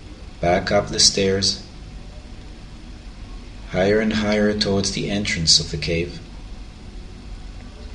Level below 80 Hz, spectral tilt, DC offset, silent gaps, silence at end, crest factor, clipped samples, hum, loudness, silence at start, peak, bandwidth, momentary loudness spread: -36 dBFS; -3 dB/octave; under 0.1%; none; 0 s; 20 dB; under 0.1%; none; -19 LUFS; 0 s; -2 dBFS; 12.5 kHz; 25 LU